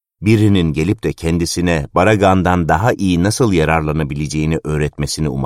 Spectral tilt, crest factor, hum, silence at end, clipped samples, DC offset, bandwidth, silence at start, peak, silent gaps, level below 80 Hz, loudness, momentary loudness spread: -6 dB/octave; 14 dB; none; 0 s; under 0.1%; under 0.1%; 15 kHz; 0.2 s; -2 dBFS; none; -32 dBFS; -15 LUFS; 7 LU